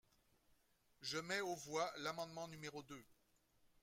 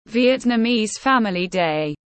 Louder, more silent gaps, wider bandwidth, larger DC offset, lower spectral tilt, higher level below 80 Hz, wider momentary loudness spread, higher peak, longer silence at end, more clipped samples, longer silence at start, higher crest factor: second, -46 LUFS vs -19 LUFS; neither; first, 16.5 kHz vs 8.8 kHz; neither; second, -3 dB/octave vs -4.5 dB/octave; second, -82 dBFS vs -56 dBFS; first, 12 LU vs 4 LU; second, -28 dBFS vs -6 dBFS; about the same, 0.15 s vs 0.2 s; neither; first, 1 s vs 0.1 s; first, 20 dB vs 14 dB